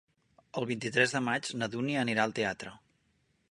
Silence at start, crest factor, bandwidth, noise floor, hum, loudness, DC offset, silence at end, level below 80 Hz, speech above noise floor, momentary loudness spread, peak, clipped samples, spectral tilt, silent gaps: 0.55 s; 22 dB; 11.5 kHz; -73 dBFS; none; -31 LUFS; under 0.1%; 0.75 s; -70 dBFS; 42 dB; 12 LU; -10 dBFS; under 0.1%; -4.5 dB/octave; none